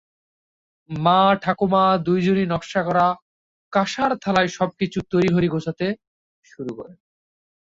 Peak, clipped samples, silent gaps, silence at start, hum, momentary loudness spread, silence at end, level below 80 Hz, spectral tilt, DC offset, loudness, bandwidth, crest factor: -2 dBFS; under 0.1%; 3.22-3.71 s, 6.07-6.43 s; 0.9 s; none; 16 LU; 0.8 s; -54 dBFS; -6.5 dB/octave; under 0.1%; -20 LUFS; 7.8 kHz; 20 dB